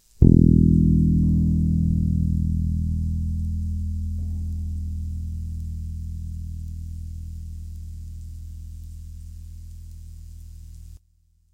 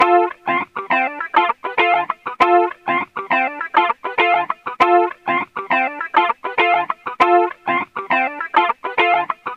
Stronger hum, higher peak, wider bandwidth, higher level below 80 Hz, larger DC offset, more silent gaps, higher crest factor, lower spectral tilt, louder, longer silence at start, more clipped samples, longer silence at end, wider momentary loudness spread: neither; about the same, 0 dBFS vs 0 dBFS; about the same, 8.4 kHz vs 8 kHz; first, -28 dBFS vs -62 dBFS; neither; neither; about the same, 22 dB vs 18 dB; first, -11 dB/octave vs -4.5 dB/octave; second, -23 LUFS vs -17 LUFS; first, 0.2 s vs 0 s; neither; first, 0.6 s vs 0 s; first, 24 LU vs 7 LU